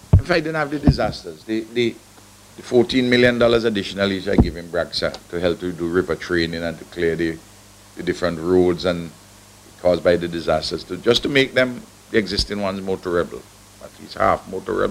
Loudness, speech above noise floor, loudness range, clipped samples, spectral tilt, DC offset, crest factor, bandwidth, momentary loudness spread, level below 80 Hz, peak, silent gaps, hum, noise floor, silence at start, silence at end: -20 LUFS; 26 dB; 4 LU; under 0.1%; -6 dB/octave; under 0.1%; 20 dB; 15.5 kHz; 11 LU; -34 dBFS; 0 dBFS; none; none; -46 dBFS; 0.15 s; 0 s